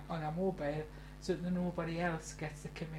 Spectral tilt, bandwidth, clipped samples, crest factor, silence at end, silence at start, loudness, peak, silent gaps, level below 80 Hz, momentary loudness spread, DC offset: -6.5 dB/octave; 14 kHz; under 0.1%; 16 dB; 0 s; 0 s; -39 LUFS; -22 dBFS; none; -54 dBFS; 8 LU; under 0.1%